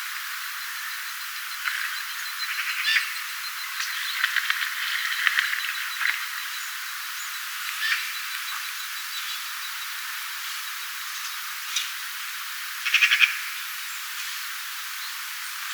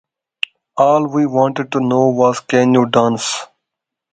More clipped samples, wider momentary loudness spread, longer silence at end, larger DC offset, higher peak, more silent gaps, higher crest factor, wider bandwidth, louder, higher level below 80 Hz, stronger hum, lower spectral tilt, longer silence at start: neither; about the same, 9 LU vs 11 LU; second, 0 s vs 0.65 s; neither; about the same, 0 dBFS vs 0 dBFS; neither; first, 28 dB vs 16 dB; first, over 20 kHz vs 9.4 kHz; second, -26 LUFS vs -15 LUFS; second, under -90 dBFS vs -58 dBFS; neither; second, 12.5 dB/octave vs -5 dB/octave; second, 0 s vs 0.75 s